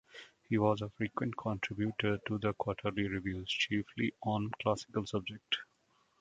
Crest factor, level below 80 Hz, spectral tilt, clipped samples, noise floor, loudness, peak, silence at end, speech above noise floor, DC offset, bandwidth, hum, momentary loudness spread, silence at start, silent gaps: 22 dB; -60 dBFS; -6 dB/octave; under 0.1%; -73 dBFS; -36 LUFS; -14 dBFS; 0.55 s; 38 dB; under 0.1%; 9 kHz; none; 5 LU; 0.15 s; none